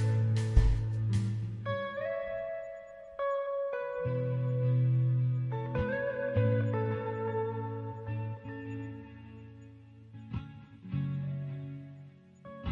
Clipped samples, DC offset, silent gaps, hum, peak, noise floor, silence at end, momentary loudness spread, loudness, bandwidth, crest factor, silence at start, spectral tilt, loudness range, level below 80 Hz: under 0.1%; under 0.1%; none; none; -10 dBFS; -53 dBFS; 0 s; 21 LU; -33 LUFS; 10.5 kHz; 22 dB; 0 s; -8.5 dB/octave; 10 LU; -42 dBFS